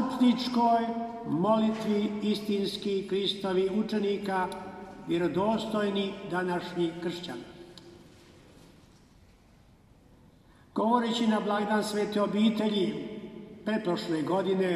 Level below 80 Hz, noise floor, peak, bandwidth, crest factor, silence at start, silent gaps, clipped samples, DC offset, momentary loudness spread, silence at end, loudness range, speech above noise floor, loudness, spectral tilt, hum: -64 dBFS; -58 dBFS; -12 dBFS; 13.5 kHz; 18 dB; 0 s; none; under 0.1%; under 0.1%; 13 LU; 0 s; 9 LU; 30 dB; -29 LUFS; -6 dB/octave; none